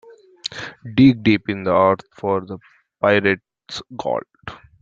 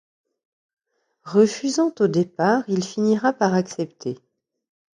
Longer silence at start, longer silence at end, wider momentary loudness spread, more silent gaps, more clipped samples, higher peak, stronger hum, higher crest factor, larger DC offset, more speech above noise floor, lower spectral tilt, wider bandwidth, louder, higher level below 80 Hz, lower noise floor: second, 0.45 s vs 1.25 s; second, 0.25 s vs 0.8 s; first, 20 LU vs 10 LU; neither; neither; about the same, -2 dBFS vs -4 dBFS; neither; about the same, 18 dB vs 18 dB; neither; second, 20 dB vs 37 dB; first, -7 dB/octave vs -5.5 dB/octave; second, 7.6 kHz vs 10.5 kHz; about the same, -19 LUFS vs -21 LUFS; first, -54 dBFS vs -68 dBFS; second, -39 dBFS vs -57 dBFS